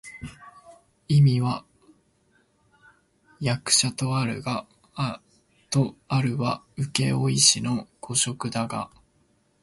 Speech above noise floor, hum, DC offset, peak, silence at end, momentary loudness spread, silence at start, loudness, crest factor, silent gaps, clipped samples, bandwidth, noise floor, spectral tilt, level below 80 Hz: 42 dB; none; under 0.1%; -4 dBFS; 0.75 s; 16 LU; 0.05 s; -24 LUFS; 22 dB; none; under 0.1%; 11.5 kHz; -65 dBFS; -4 dB/octave; -58 dBFS